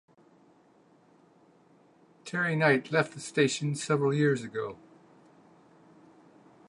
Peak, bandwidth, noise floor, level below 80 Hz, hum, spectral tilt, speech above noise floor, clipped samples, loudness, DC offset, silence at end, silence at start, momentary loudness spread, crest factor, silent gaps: -8 dBFS; 11 kHz; -62 dBFS; -78 dBFS; none; -5.5 dB/octave; 34 dB; under 0.1%; -28 LUFS; under 0.1%; 1.95 s; 2.25 s; 13 LU; 24 dB; none